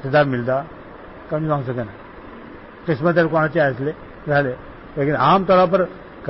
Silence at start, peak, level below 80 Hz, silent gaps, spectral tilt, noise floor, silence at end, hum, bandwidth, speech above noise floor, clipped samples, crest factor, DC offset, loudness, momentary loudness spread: 0 s; -4 dBFS; -48 dBFS; none; -11.5 dB/octave; -38 dBFS; 0 s; none; 5.8 kHz; 20 dB; under 0.1%; 16 dB; under 0.1%; -19 LUFS; 23 LU